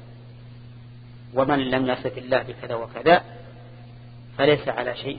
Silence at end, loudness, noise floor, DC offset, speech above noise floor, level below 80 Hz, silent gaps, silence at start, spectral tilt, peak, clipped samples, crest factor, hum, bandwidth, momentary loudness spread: 0 s; -23 LUFS; -43 dBFS; under 0.1%; 20 dB; -54 dBFS; none; 0 s; -10 dB/octave; -2 dBFS; under 0.1%; 22 dB; none; 5 kHz; 25 LU